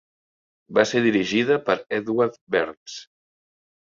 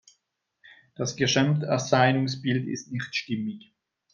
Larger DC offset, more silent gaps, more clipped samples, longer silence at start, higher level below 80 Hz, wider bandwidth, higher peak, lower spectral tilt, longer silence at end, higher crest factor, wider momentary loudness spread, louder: neither; first, 2.41-2.47 s, 2.77-2.86 s vs none; neither; second, 0.7 s vs 1 s; about the same, -64 dBFS vs -66 dBFS; about the same, 7.6 kHz vs 7.4 kHz; first, -2 dBFS vs -6 dBFS; about the same, -5 dB/octave vs -5 dB/octave; first, 0.9 s vs 0.55 s; about the same, 22 dB vs 22 dB; first, 14 LU vs 11 LU; first, -22 LUFS vs -26 LUFS